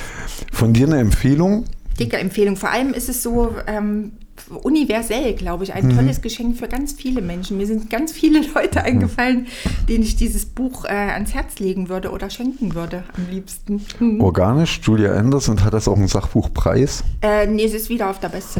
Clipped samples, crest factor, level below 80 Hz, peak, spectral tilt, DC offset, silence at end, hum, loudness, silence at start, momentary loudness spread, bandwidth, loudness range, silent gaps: under 0.1%; 14 dB; -28 dBFS; -4 dBFS; -6 dB/octave; under 0.1%; 0 s; none; -19 LUFS; 0 s; 10 LU; 20 kHz; 5 LU; none